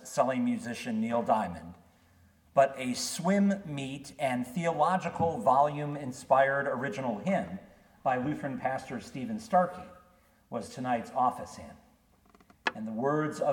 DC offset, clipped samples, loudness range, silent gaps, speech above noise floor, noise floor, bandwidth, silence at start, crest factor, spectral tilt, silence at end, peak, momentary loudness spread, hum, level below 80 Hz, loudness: under 0.1%; under 0.1%; 5 LU; none; 34 dB; -64 dBFS; 18 kHz; 0 s; 20 dB; -5.5 dB/octave; 0 s; -10 dBFS; 14 LU; none; -66 dBFS; -30 LUFS